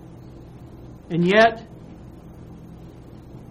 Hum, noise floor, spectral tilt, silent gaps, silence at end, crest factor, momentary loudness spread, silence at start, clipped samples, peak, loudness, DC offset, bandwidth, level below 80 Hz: none; -42 dBFS; -6.5 dB/octave; none; 0.1 s; 22 dB; 27 LU; 0.4 s; under 0.1%; -2 dBFS; -18 LUFS; under 0.1%; 10 kHz; -50 dBFS